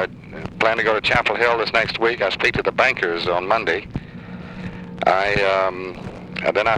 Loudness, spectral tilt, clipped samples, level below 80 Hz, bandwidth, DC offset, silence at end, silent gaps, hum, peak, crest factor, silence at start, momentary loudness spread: -19 LUFS; -5 dB/octave; under 0.1%; -44 dBFS; 12 kHz; under 0.1%; 0 s; none; none; -2 dBFS; 18 dB; 0 s; 16 LU